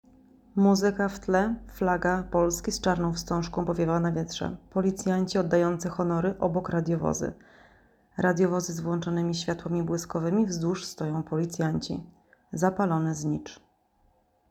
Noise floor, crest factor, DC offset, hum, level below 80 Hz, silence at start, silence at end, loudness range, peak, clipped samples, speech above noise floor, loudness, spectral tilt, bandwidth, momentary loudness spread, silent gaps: -66 dBFS; 18 dB; under 0.1%; none; -50 dBFS; 0.55 s; 0.95 s; 3 LU; -10 dBFS; under 0.1%; 40 dB; -28 LUFS; -6 dB/octave; 15.5 kHz; 7 LU; none